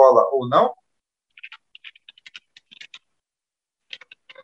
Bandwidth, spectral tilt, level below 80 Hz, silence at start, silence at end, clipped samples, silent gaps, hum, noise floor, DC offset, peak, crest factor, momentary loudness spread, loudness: 7.4 kHz; -6.5 dB/octave; -78 dBFS; 0 s; 3 s; under 0.1%; none; none; -89 dBFS; under 0.1%; -2 dBFS; 22 dB; 25 LU; -18 LUFS